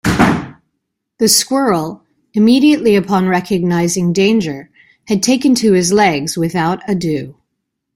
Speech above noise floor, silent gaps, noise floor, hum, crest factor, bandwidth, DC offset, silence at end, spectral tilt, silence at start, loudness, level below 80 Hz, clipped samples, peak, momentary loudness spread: 61 dB; none; -73 dBFS; none; 14 dB; 16.5 kHz; under 0.1%; 0.65 s; -4.5 dB/octave; 0.05 s; -13 LUFS; -42 dBFS; under 0.1%; 0 dBFS; 11 LU